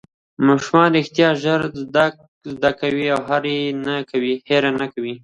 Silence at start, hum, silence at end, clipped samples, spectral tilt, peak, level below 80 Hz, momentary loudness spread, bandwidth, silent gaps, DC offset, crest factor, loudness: 0.4 s; none; 0.05 s; under 0.1%; -6 dB/octave; 0 dBFS; -58 dBFS; 8 LU; 10.5 kHz; 2.28-2.41 s; under 0.1%; 18 dB; -19 LUFS